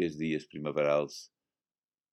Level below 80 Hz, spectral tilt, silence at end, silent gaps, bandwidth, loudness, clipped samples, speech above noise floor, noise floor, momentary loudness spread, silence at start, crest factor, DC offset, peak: -70 dBFS; -6 dB/octave; 0.85 s; none; 14 kHz; -32 LUFS; under 0.1%; over 58 dB; under -90 dBFS; 11 LU; 0 s; 18 dB; under 0.1%; -16 dBFS